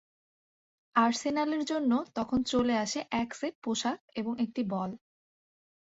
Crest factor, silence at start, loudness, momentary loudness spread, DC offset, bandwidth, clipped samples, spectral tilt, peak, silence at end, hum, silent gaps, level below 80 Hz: 20 dB; 0.95 s; -31 LUFS; 8 LU; under 0.1%; 8 kHz; under 0.1%; -4 dB/octave; -12 dBFS; 0.95 s; none; 3.55-3.62 s, 4.00-4.08 s; -62 dBFS